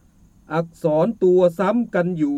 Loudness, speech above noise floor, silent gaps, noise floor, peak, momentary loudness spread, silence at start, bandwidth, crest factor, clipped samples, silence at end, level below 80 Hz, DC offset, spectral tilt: -20 LUFS; 33 dB; none; -51 dBFS; -6 dBFS; 10 LU; 0.5 s; 13 kHz; 14 dB; under 0.1%; 0 s; -56 dBFS; under 0.1%; -8.5 dB/octave